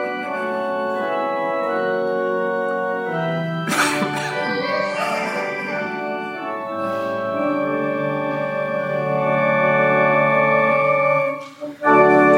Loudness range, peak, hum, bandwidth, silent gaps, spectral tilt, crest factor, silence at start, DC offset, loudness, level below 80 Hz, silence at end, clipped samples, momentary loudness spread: 6 LU; -2 dBFS; none; 16.5 kHz; none; -5.5 dB/octave; 18 dB; 0 s; under 0.1%; -20 LUFS; -64 dBFS; 0 s; under 0.1%; 9 LU